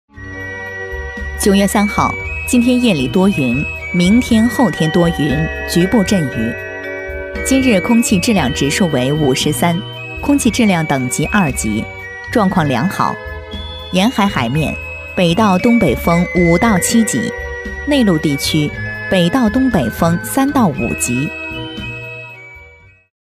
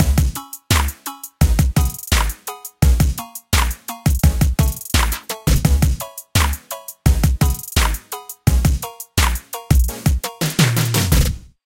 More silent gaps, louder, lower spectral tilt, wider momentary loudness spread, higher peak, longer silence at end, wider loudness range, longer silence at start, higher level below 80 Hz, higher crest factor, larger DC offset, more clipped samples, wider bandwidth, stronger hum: neither; first, -15 LUFS vs -19 LUFS; about the same, -5 dB/octave vs -4.5 dB/octave; about the same, 12 LU vs 10 LU; about the same, 0 dBFS vs 0 dBFS; first, 0.55 s vs 0.25 s; about the same, 3 LU vs 1 LU; first, 0.15 s vs 0 s; second, -32 dBFS vs -20 dBFS; about the same, 14 dB vs 18 dB; neither; neither; about the same, 16 kHz vs 17 kHz; neither